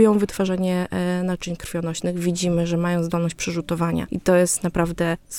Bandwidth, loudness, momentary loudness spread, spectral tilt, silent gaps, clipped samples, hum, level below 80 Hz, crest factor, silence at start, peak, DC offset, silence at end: 16.5 kHz; -22 LUFS; 8 LU; -5.5 dB/octave; none; under 0.1%; none; -44 dBFS; 18 dB; 0 s; -4 dBFS; under 0.1%; 0 s